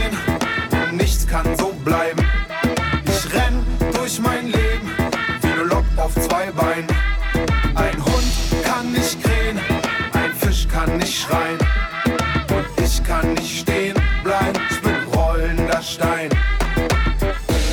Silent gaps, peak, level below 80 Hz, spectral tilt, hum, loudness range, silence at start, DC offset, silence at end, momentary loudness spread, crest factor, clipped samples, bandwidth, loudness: none; -6 dBFS; -22 dBFS; -5 dB/octave; none; 0 LU; 0 s; under 0.1%; 0 s; 2 LU; 12 dB; under 0.1%; 19 kHz; -19 LUFS